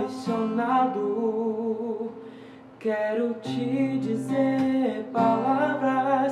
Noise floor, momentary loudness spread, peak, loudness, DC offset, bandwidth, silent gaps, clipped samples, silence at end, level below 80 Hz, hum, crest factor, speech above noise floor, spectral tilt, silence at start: -45 dBFS; 9 LU; -10 dBFS; -26 LUFS; under 0.1%; 11 kHz; none; under 0.1%; 0 s; -74 dBFS; none; 16 dB; 21 dB; -7 dB/octave; 0 s